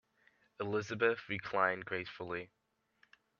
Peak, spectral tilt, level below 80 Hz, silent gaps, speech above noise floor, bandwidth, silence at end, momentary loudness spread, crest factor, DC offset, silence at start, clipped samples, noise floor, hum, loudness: -16 dBFS; -5.5 dB/octave; -76 dBFS; none; 37 dB; 7.2 kHz; 0.95 s; 11 LU; 24 dB; under 0.1%; 0.6 s; under 0.1%; -73 dBFS; none; -36 LUFS